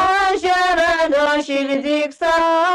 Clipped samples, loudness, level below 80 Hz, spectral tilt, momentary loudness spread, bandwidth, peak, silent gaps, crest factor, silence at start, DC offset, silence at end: under 0.1%; -17 LUFS; -46 dBFS; -2.5 dB/octave; 4 LU; 13 kHz; -8 dBFS; none; 10 dB; 0 s; under 0.1%; 0 s